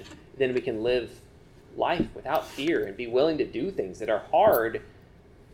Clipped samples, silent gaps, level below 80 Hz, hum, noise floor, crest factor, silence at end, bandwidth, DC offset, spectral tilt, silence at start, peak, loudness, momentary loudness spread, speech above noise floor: under 0.1%; none; -54 dBFS; none; -53 dBFS; 18 dB; 0.65 s; 17 kHz; under 0.1%; -6 dB/octave; 0 s; -8 dBFS; -27 LUFS; 10 LU; 27 dB